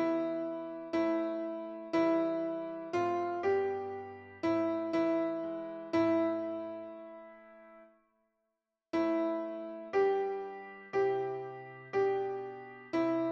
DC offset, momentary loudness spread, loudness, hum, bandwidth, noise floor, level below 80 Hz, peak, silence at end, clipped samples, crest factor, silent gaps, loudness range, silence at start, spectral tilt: under 0.1%; 14 LU; -34 LUFS; none; 6.8 kHz; -86 dBFS; -76 dBFS; -18 dBFS; 0 s; under 0.1%; 16 dB; none; 4 LU; 0 s; -7 dB/octave